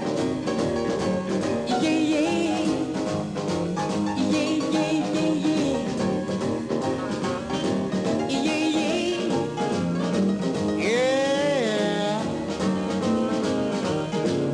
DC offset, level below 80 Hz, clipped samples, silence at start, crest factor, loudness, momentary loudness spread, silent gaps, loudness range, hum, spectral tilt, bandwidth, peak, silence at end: under 0.1%; -54 dBFS; under 0.1%; 0 s; 12 dB; -25 LUFS; 5 LU; none; 2 LU; none; -5.5 dB/octave; 11.5 kHz; -12 dBFS; 0 s